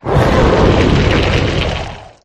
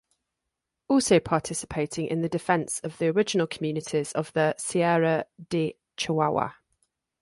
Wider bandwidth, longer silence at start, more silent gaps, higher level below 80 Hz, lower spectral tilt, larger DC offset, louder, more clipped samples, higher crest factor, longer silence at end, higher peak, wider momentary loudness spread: about the same, 12.5 kHz vs 11.5 kHz; second, 0.05 s vs 0.9 s; neither; first, -20 dBFS vs -60 dBFS; first, -6.5 dB/octave vs -5 dB/octave; neither; first, -12 LUFS vs -26 LUFS; neither; second, 12 dB vs 18 dB; second, 0.2 s vs 0.7 s; first, 0 dBFS vs -8 dBFS; about the same, 9 LU vs 8 LU